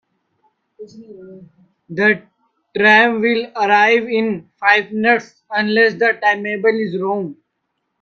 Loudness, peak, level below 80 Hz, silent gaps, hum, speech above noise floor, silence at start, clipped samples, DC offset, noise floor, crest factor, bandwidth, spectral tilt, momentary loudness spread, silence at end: -15 LUFS; 0 dBFS; -66 dBFS; none; none; 56 dB; 0.8 s; under 0.1%; under 0.1%; -73 dBFS; 18 dB; 6.8 kHz; -5.5 dB/octave; 11 LU; 0.7 s